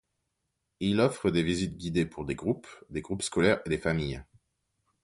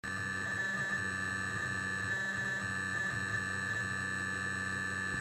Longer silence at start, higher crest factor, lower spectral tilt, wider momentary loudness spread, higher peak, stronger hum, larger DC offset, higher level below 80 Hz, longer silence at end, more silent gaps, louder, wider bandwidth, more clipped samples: first, 0.8 s vs 0.05 s; first, 22 dB vs 12 dB; first, -5.5 dB/octave vs -3.5 dB/octave; first, 10 LU vs 1 LU; first, -10 dBFS vs -24 dBFS; neither; neither; first, -50 dBFS vs -64 dBFS; first, 0.8 s vs 0 s; neither; first, -30 LUFS vs -35 LUFS; second, 11.5 kHz vs 16 kHz; neither